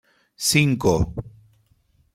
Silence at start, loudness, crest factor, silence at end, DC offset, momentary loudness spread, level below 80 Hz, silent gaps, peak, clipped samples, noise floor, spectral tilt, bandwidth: 0.4 s; -20 LUFS; 20 dB; 0.85 s; under 0.1%; 10 LU; -40 dBFS; none; -4 dBFS; under 0.1%; -62 dBFS; -4.5 dB/octave; 16 kHz